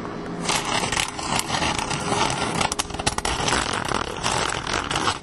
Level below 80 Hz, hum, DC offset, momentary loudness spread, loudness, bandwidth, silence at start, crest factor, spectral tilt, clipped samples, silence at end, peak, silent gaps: -40 dBFS; none; under 0.1%; 3 LU; -23 LUFS; 16 kHz; 0 s; 20 dB; -2.5 dB/octave; under 0.1%; 0 s; -4 dBFS; none